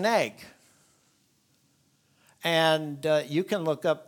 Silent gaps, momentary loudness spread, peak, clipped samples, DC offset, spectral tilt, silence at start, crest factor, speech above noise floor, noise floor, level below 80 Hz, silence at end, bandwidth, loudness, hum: none; 10 LU; -8 dBFS; under 0.1%; under 0.1%; -4.5 dB/octave; 0 s; 22 dB; 41 dB; -68 dBFS; -78 dBFS; 0.05 s; 19 kHz; -27 LUFS; none